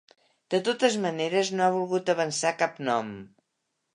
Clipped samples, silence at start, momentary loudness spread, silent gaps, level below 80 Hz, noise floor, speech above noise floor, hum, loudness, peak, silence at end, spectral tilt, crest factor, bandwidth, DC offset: under 0.1%; 0.5 s; 6 LU; none; -76 dBFS; -79 dBFS; 53 dB; none; -26 LUFS; -8 dBFS; 0.7 s; -4 dB/octave; 20 dB; 11 kHz; under 0.1%